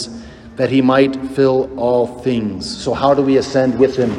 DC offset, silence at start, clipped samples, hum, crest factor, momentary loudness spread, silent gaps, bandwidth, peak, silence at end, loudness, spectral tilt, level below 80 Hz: under 0.1%; 0 s; under 0.1%; none; 16 dB; 10 LU; none; 10.5 kHz; 0 dBFS; 0 s; -16 LUFS; -6 dB/octave; -46 dBFS